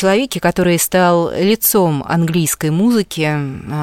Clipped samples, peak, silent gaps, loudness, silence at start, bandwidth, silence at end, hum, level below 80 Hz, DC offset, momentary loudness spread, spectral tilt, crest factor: under 0.1%; 0 dBFS; none; -15 LUFS; 0 s; 17 kHz; 0 s; none; -44 dBFS; 0.2%; 6 LU; -5 dB/octave; 14 dB